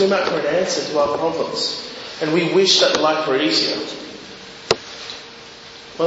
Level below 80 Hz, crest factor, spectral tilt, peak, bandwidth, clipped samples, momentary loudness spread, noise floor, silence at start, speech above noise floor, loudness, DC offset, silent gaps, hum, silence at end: -58 dBFS; 20 dB; -3 dB/octave; 0 dBFS; 8 kHz; under 0.1%; 22 LU; -39 dBFS; 0 s; 21 dB; -18 LUFS; under 0.1%; none; none; 0 s